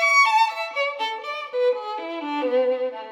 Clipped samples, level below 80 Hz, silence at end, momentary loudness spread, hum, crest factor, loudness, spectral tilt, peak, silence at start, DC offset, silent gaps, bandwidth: under 0.1%; under -90 dBFS; 0 s; 12 LU; none; 16 dB; -22 LUFS; 0 dB/octave; -6 dBFS; 0 s; under 0.1%; none; 18 kHz